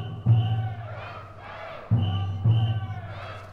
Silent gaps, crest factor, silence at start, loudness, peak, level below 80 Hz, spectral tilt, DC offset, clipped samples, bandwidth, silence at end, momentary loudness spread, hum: none; 16 dB; 0 s; -26 LUFS; -10 dBFS; -52 dBFS; -9 dB/octave; under 0.1%; under 0.1%; 4.8 kHz; 0 s; 16 LU; none